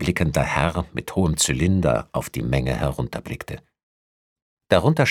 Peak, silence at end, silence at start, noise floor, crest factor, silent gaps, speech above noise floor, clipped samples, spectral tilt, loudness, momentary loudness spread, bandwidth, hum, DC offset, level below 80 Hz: -2 dBFS; 0 s; 0 s; under -90 dBFS; 22 dB; 3.83-4.36 s, 4.42-4.57 s; over 69 dB; under 0.1%; -5 dB/octave; -22 LUFS; 13 LU; 17.5 kHz; none; under 0.1%; -36 dBFS